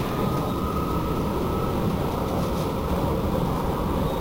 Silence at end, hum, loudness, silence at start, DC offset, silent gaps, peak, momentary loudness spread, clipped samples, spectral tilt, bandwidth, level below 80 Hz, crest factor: 0 s; none; -26 LUFS; 0 s; under 0.1%; none; -14 dBFS; 1 LU; under 0.1%; -7 dB/octave; 16 kHz; -34 dBFS; 12 dB